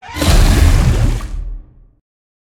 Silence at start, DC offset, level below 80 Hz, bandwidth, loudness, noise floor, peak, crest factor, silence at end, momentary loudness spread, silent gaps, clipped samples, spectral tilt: 0.05 s; under 0.1%; -16 dBFS; 16.5 kHz; -14 LUFS; -31 dBFS; 0 dBFS; 14 dB; 0.85 s; 17 LU; none; under 0.1%; -5 dB/octave